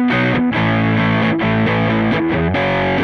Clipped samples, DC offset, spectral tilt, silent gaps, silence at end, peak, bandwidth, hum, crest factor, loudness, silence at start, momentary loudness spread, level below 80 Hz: under 0.1%; under 0.1%; -8 dB/octave; none; 0 s; -4 dBFS; 6.6 kHz; none; 10 dB; -15 LUFS; 0 s; 1 LU; -38 dBFS